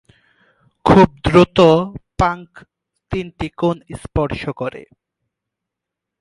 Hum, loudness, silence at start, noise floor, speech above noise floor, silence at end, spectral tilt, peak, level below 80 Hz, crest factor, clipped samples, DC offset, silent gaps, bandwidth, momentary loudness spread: none; -16 LUFS; 0.85 s; -83 dBFS; 67 dB; 1.4 s; -7 dB/octave; 0 dBFS; -36 dBFS; 18 dB; under 0.1%; under 0.1%; none; 11.5 kHz; 16 LU